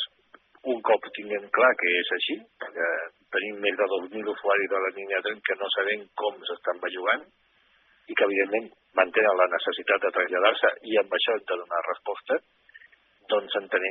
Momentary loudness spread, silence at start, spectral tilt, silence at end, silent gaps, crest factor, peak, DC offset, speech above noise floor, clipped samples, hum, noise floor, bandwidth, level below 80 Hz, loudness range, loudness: 10 LU; 0 s; 1.5 dB/octave; 0 s; none; 22 dB; -6 dBFS; under 0.1%; 37 dB; under 0.1%; none; -63 dBFS; 4.2 kHz; -80 dBFS; 4 LU; -26 LUFS